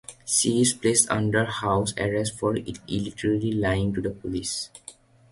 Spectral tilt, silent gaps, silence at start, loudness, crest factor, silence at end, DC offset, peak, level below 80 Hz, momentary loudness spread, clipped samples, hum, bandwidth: -4 dB/octave; none; 0.1 s; -24 LUFS; 20 dB; 0.4 s; under 0.1%; -4 dBFS; -48 dBFS; 11 LU; under 0.1%; none; 11.5 kHz